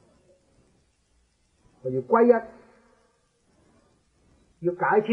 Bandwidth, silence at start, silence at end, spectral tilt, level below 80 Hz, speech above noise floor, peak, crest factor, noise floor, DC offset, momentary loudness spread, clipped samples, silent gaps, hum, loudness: 4.7 kHz; 1.85 s; 0 s; -8.5 dB/octave; -68 dBFS; 45 dB; -4 dBFS; 22 dB; -67 dBFS; under 0.1%; 16 LU; under 0.1%; none; none; -24 LUFS